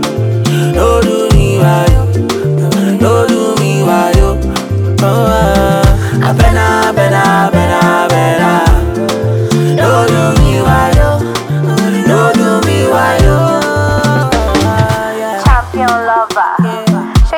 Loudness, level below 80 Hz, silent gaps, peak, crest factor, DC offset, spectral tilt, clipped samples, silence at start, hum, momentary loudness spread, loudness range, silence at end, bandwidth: -10 LUFS; -18 dBFS; none; 0 dBFS; 10 dB; under 0.1%; -6 dB/octave; under 0.1%; 0 s; none; 4 LU; 2 LU; 0 s; 19 kHz